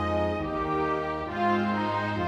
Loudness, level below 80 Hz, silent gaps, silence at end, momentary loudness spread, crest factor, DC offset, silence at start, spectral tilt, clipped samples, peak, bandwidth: -28 LUFS; -48 dBFS; none; 0 s; 4 LU; 12 dB; under 0.1%; 0 s; -7.5 dB/octave; under 0.1%; -14 dBFS; 9.8 kHz